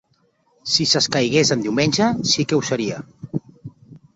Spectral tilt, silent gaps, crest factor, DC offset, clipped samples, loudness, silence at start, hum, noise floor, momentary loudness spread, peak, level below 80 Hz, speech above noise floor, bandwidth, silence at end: -3.5 dB/octave; none; 18 dB; under 0.1%; under 0.1%; -18 LUFS; 0.65 s; none; -63 dBFS; 14 LU; -2 dBFS; -56 dBFS; 44 dB; 8.2 kHz; 0.2 s